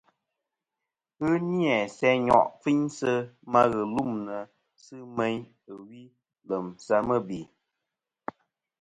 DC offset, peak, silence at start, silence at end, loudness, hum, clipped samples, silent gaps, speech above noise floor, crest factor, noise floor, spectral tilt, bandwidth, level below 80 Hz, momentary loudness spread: under 0.1%; -4 dBFS; 1.2 s; 1.35 s; -26 LUFS; none; under 0.1%; none; 61 dB; 24 dB; -88 dBFS; -6.5 dB/octave; 11 kHz; -64 dBFS; 20 LU